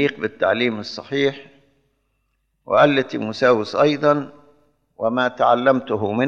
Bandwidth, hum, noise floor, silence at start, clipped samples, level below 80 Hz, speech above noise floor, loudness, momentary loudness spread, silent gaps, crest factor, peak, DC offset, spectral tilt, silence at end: 7.6 kHz; none; -69 dBFS; 0 s; under 0.1%; -66 dBFS; 51 dB; -19 LUFS; 10 LU; none; 18 dB; -2 dBFS; under 0.1%; -6 dB/octave; 0 s